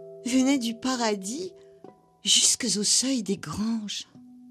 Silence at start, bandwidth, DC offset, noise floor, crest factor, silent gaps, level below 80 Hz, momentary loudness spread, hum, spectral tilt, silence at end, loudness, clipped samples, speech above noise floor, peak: 0 s; 13.5 kHz; under 0.1%; -52 dBFS; 20 dB; none; -62 dBFS; 16 LU; none; -2 dB/octave; 0 s; -24 LUFS; under 0.1%; 26 dB; -6 dBFS